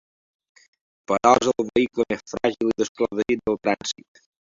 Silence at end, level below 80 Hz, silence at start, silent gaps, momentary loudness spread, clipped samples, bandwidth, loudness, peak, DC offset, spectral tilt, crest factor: 0.65 s; -56 dBFS; 1.1 s; 2.89-2.95 s; 9 LU; under 0.1%; 7.8 kHz; -23 LUFS; 0 dBFS; under 0.1%; -4 dB/octave; 24 dB